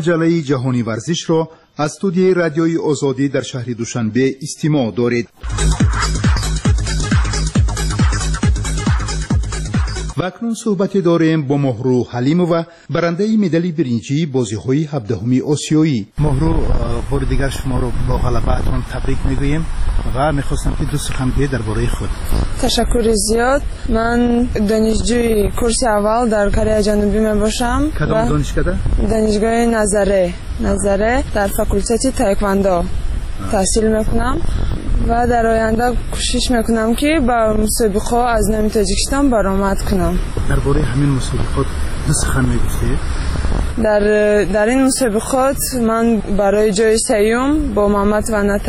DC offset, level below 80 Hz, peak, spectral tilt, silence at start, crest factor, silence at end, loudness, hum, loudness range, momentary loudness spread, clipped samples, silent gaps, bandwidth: under 0.1%; -22 dBFS; -4 dBFS; -5.5 dB/octave; 0 s; 12 dB; 0 s; -16 LUFS; none; 4 LU; 7 LU; under 0.1%; none; 13.5 kHz